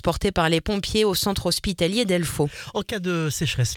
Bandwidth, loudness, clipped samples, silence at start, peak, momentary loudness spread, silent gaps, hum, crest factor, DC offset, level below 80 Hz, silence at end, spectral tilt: 18.5 kHz; -23 LUFS; under 0.1%; 0.05 s; -4 dBFS; 5 LU; none; none; 18 dB; under 0.1%; -40 dBFS; 0 s; -4.5 dB/octave